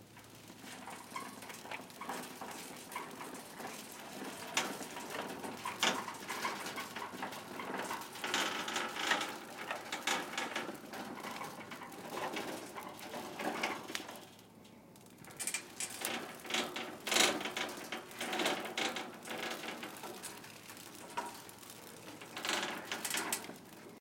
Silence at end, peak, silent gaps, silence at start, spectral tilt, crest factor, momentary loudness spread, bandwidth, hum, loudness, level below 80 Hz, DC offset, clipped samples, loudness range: 0 s; -14 dBFS; none; 0 s; -1.5 dB/octave; 28 dB; 15 LU; 17 kHz; none; -39 LUFS; -80 dBFS; under 0.1%; under 0.1%; 9 LU